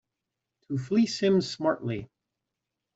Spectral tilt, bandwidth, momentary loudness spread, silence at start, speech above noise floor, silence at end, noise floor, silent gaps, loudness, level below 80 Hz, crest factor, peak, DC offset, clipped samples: -6 dB/octave; 8 kHz; 11 LU; 0.7 s; 59 dB; 0.9 s; -86 dBFS; none; -27 LUFS; -66 dBFS; 18 dB; -12 dBFS; under 0.1%; under 0.1%